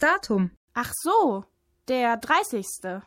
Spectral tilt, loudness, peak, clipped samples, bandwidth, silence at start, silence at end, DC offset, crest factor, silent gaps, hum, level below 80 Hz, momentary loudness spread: -4 dB/octave; -25 LUFS; -8 dBFS; under 0.1%; 17 kHz; 0 s; 0.05 s; under 0.1%; 16 dB; 0.57-0.68 s; none; -60 dBFS; 10 LU